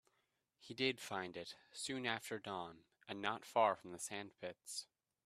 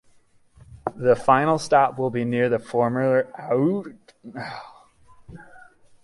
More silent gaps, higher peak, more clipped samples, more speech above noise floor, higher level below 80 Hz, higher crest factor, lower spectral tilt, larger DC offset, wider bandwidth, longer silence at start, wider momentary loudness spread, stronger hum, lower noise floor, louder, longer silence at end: neither; second, -20 dBFS vs -4 dBFS; neither; first, 41 dB vs 35 dB; second, -86 dBFS vs -58 dBFS; about the same, 24 dB vs 20 dB; second, -3 dB/octave vs -6.5 dB/octave; neither; first, 14.5 kHz vs 11.5 kHz; about the same, 0.6 s vs 0.7 s; about the same, 15 LU vs 17 LU; neither; first, -84 dBFS vs -57 dBFS; second, -43 LUFS vs -22 LUFS; about the same, 0.45 s vs 0.45 s